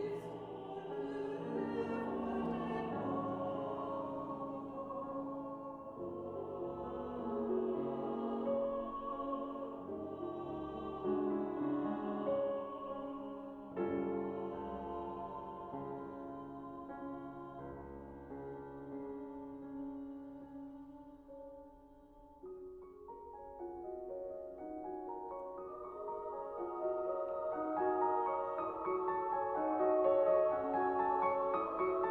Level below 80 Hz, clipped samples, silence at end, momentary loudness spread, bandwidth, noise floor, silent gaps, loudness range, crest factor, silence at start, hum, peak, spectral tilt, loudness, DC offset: -66 dBFS; under 0.1%; 0 s; 15 LU; 4.7 kHz; -60 dBFS; none; 14 LU; 18 dB; 0 s; none; -22 dBFS; -9 dB/octave; -40 LUFS; under 0.1%